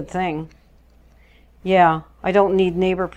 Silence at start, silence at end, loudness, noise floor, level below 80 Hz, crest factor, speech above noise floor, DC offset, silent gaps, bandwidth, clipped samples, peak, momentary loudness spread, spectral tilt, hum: 0 s; 0.1 s; -18 LUFS; -51 dBFS; -46 dBFS; 18 dB; 33 dB; under 0.1%; none; 8.6 kHz; under 0.1%; -2 dBFS; 16 LU; -7.5 dB/octave; none